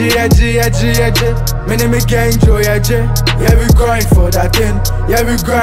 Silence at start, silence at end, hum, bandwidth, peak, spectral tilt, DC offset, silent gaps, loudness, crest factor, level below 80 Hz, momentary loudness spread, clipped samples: 0 s; 0 s; none; 16.5 kHz; 0 dBFS; -5 dB/octave; 0.8%; none; -11 LUFS; 10 dB; -14 dBFS; 4 LU; under 0.1%